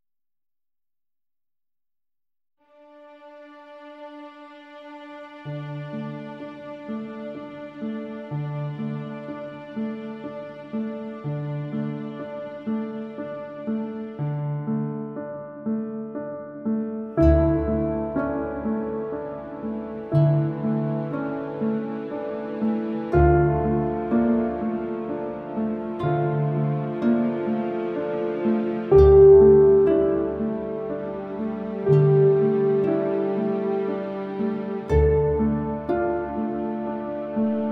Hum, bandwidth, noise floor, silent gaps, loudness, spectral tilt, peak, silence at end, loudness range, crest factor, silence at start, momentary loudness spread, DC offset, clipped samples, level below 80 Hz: none; 4.6 kHz; under -90 dBFS; none; -23 LUFS; -11 dB/octave; -4 dBFS; 0 s; 17 LU; 20 dB; 2.95 s; 16 LU; under 0.1%; under 0.1%; -38 dBFS